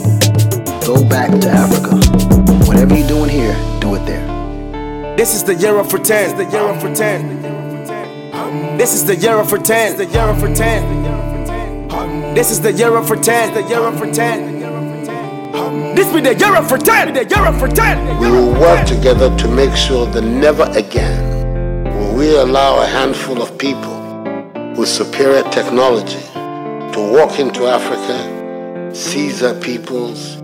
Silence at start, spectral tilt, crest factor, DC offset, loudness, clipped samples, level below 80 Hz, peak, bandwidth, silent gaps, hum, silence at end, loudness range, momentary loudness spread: 0 s; -5 dB/octave; 12 dB; under 0.1%; -13 LUFS; under 0.1%; -22 dBFS; 0 dBFS; 17 kHz; none; none; 0 s; 5 LU; 13 LU